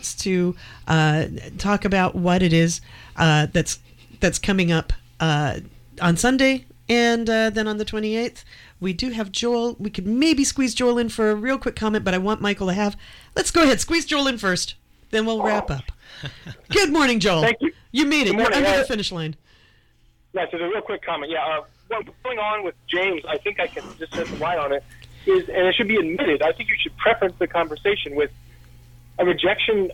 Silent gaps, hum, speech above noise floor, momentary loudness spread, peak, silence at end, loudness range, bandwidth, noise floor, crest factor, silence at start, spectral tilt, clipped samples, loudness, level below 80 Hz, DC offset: none; none; 36 dB; 12 LU; -6 dBFS; 0 s; 5 LU; 16.5 kHz; -57 dBFS; 16 dB; 0 s; -4.5 dB/octave; under 0.1%; -21 LUFS; -42 dBFS; under 0.1%